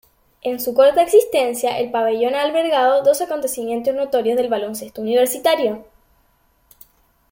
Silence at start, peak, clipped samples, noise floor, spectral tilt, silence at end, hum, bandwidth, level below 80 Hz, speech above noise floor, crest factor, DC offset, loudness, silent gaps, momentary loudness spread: 0.45 s; -2 dBFS; under 0.1%; -60 dBFS; -3 dB/octave; 1.5 s; none; 17 kHz; -60 dBFS; 42 dB; 16 dB; under 0.1%; -18 LUFS; none; 9 LU